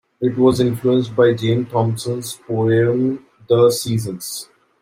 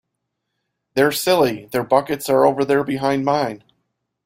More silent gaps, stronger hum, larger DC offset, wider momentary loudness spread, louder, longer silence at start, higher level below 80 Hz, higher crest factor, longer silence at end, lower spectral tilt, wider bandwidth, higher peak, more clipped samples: neither; neither; neither; about the same, 11 LU vs 9 LU; about the same, -18 LUFS vs -19 LUFS; second, 0.2 s vs 0.95 s; about the same, -54 dBFS vs -58 dBFS; about the same, 16 dB vs 18 dB; second, 0.35 s vs 0.7 s; about the same, -6 dB/octave vs -5 dB/octave; about the same, 16 kHz vs 16 kHz; about the same, -2 dBFS vs -2 dBFS; neither